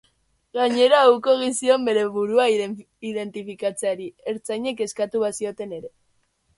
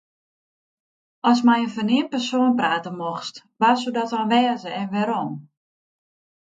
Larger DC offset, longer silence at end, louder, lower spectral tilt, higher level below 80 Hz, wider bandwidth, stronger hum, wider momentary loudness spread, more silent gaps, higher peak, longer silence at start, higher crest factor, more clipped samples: neither; second, 0.7 s vs 1.1 s; about the same, -22 LUFS vs -21 LUFS; second, -3.5 dB/octave vs -5 dB/octave; about the same, -68 dBFS vs -72 dBFS; first, 11.5 kHz vs 7.8 kHz; neither; first, 16 LU vs 11 LU; neither; about the same, -4 dBFS vs -4 dBFS; second, 0.55 s vs 1.25 s; about the same, 18 dB vs 18 dB; neither